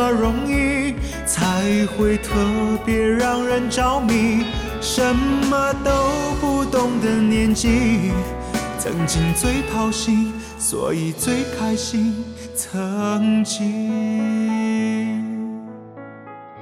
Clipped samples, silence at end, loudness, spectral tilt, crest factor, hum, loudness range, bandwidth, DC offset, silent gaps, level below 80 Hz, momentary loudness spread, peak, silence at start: under 0.1%; 0 s; -20 LUFS; -4.5 dB/octave; 14 dB; none; 3 LU; 16.5 kHz; under 0.1%; none; -32 dBFS; 8 LU; -6 dBFS; 0 s